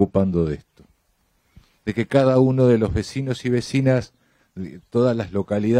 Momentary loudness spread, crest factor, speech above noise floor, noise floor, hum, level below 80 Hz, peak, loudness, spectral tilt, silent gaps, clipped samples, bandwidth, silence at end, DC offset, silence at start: 17 LU; 18 dB; 46 dB; -66 dBFS; none; -42 dBFS; -4 dBFS; -20 LUFS; -7.5 dB/octave; none; under 0.1%; 10.5 kHz; 0 s; under 0.1%; 0 s